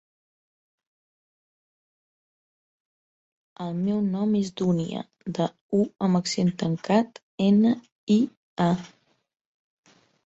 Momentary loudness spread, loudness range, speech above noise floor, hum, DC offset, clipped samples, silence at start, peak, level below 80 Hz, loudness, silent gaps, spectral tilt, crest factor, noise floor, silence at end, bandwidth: 11 LU; 8 LU; over 66 dB; none; under 0.1%; under 0.1%; 3.6 s; -8 dBFS; -66 dBFS; -25 LUFS; 5.61-5.69 s, 7.23-7.38 s, 7.92-8.07 s, 8.37-8.57 s; -7 dB/octave; 18 dB; under -90 dBFS; 1.4 s; 8 kHz